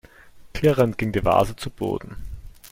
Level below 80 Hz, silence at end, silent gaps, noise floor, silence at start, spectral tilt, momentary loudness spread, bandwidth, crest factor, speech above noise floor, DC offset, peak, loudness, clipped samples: -40 dBFS; 0 s; none; -46 dBFS; 0.25 s; -6.5 dB/octave; 20 LU; 16.5 kHz; 18 dB; 25 dB; under 0.1%; -4 dBFS; -22 LUFS; under 0.1%